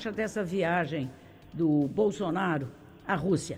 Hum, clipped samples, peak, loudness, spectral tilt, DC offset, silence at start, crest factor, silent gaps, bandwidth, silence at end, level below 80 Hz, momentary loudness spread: none; under 0.1%; -14 dBFS; -29 LUFS; -6.5 dB/octave; under 0.1%; 0 s; 14 dB; none; 16.5 kHz; 0 s; -58 dBFS; 13 LU